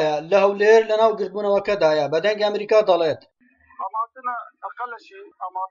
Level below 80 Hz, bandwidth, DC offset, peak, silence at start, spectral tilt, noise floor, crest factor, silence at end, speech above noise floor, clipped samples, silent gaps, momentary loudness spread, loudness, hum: -64 dBFS; 7.4 kHz; under 0.1%; -4 dBFS; 0 s; -5 dB/octave; -39 dBFS; 16 dB; 0.05 s; 19 dB; under 0.1%; none; 17 LU; -19 LUFS; none